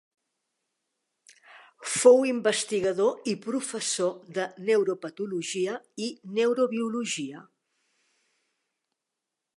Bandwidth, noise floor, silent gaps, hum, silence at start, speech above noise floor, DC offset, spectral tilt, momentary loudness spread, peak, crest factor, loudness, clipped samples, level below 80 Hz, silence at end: 11.5 kHz; -86 dBFS; none; none; 1.55 s; 60 dB; under 0.1%; -3.5 dB/octave; 13 LU; -6 dBFS; 22 dB; -26 LUFS; under 0.1%; -78 dBFS; 2.15 s